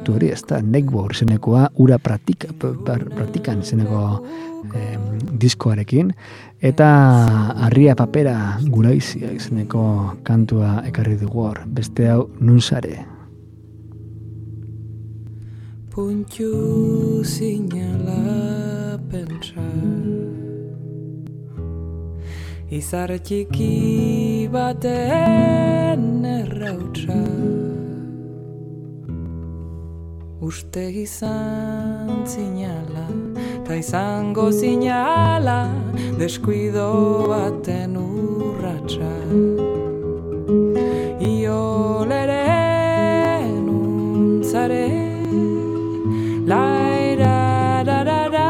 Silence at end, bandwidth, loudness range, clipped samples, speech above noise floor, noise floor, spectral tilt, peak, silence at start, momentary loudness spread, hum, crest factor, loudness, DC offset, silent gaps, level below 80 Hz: 0 s; 15 kHz; 11 LU; under 0.1%; 22 dB; -40 dBFS; -7.5 dB/octave; 0 dBFS; 0 s; 16 LU; none; 18 dB; -19 LUFS; under 0.1%; none; -44 dBFS